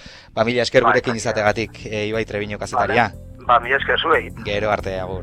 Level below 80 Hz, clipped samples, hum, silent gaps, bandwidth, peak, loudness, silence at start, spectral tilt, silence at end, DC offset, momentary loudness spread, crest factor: -42 dBFS; under 0.1%; none; none; 13.5 kHz; 0 dBFS; -19 LUFS; 0 s; -4.5 dB/octave; 0 s; under 0.1%; 10 LU; 20 dB